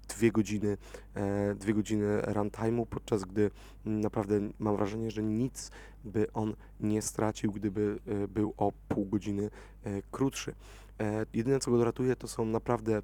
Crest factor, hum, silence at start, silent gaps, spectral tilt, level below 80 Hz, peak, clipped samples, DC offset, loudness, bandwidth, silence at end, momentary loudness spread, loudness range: 20 dB; none; 0 s; none; -6.5 dB/octave; -52 dBFS; -12 dBFS; under 0.1%; under 0.1%; -33 LUFS; 19 kHz; 0 s; 10 LU; 2 LU